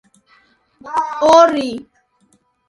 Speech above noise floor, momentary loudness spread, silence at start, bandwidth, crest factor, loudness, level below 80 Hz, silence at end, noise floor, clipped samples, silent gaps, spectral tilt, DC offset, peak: 46 dB; 15 LU; 0.85 s; 11.5 kHz; 18 dB; -14 LUFS; -58 dBFS; 0.85 s; -59 dBFS; under 0.1%; none; -3.5 dB/octave; under 0.1%; 0 dBFS